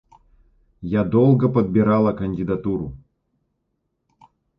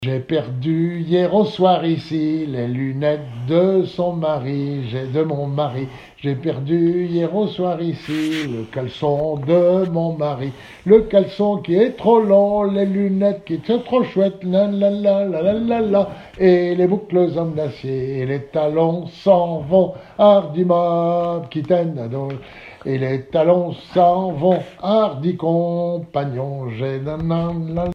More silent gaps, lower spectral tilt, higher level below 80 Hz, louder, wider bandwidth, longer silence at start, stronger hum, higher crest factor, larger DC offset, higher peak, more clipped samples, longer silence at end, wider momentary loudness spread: neither; first, -11.5 dB/octave vs -9 dB/octave; about the same, -48 dBFS vs -50 dBFS; about the same, -19 LUFS vs -19 LUFS; second, 5.2 kHz vs 8.8 kHz; first, 0.8 s vs 0 s; neither; about the same, 18 dB vs 18 dB; neither; second, -4 dBFS vs 0 dBFS; neither; first, 1.65 s vs 0 s; about the same, 11 LU vs 10 LU